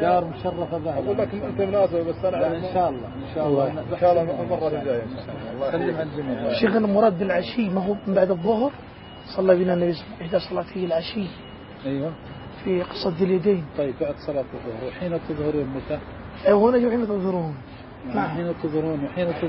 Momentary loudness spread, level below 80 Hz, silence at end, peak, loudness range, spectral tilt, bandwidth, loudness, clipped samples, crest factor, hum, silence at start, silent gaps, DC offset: 13 LU; -48 dBFS; 0 s; -4 dBFS; 4 LU; -11.5 dB/octave; 5.8 kHz; -24 LUFS; under 0.1%; 20 dB; none; 0 s; none; under 0.1%